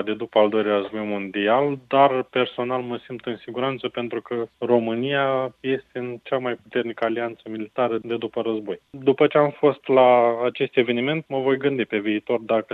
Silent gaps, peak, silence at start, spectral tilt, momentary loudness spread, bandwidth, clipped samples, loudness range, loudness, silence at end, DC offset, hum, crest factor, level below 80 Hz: none; -4 dBFS; 0 s; -8.5 dB/octave; 11 LU; 4.7 kHz; under 0.1%; 6 LU; -22 LUFS; 0 s; under 0.1%; none; 18 dB; -70 dBFS